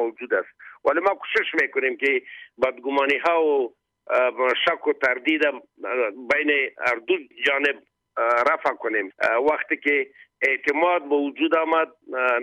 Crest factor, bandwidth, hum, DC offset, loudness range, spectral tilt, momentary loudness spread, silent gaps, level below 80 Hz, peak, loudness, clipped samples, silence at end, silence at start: 14 dB; 10.5 kHz; none; under 0.1%; 1 LU; -3.5 dB/octave; 6 LU; none; -68 dBFS; -8 dBFS; -22 LUFS; under 0.1%; 0 s; 0 s